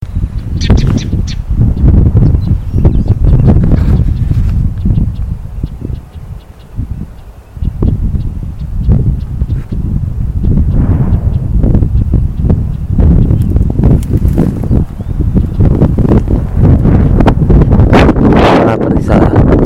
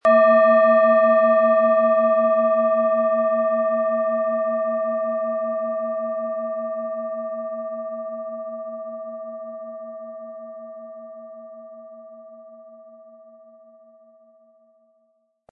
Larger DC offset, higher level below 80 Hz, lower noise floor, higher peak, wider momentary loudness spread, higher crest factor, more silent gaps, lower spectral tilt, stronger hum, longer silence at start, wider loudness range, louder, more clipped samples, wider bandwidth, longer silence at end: neither; first, -12 dBFS vs -82 dBFS; second, -29 dBFS vs -67 dBFS; first, 0 dBFS vs -6 dBFS; second, 14 LU vs 23 LU; second, 8 dB vs 16 dB; neither; first, -9 dB/octave vs -7.5 dB/octave; neither; about the same, 0 s vs 0.05 s; second, 9 LU vs 22 LU; first, -11 LUFS vs -20 LUFS; neither; first, 7.8 kHz vs 4.4 kHz; second, 0 s vs 2.6 s